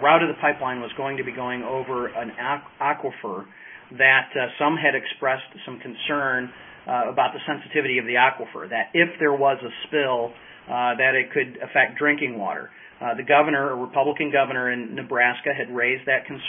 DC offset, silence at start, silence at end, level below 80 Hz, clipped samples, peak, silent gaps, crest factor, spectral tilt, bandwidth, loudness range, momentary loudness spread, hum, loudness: under 0.1%; 0 s; 0 s; -68 dBFS; under 0.1%; -2 dBFS; none; 20 dB; -9 dB/octave; 3.8 kHz; 3 LU; 12 LU; none; -22 LUFS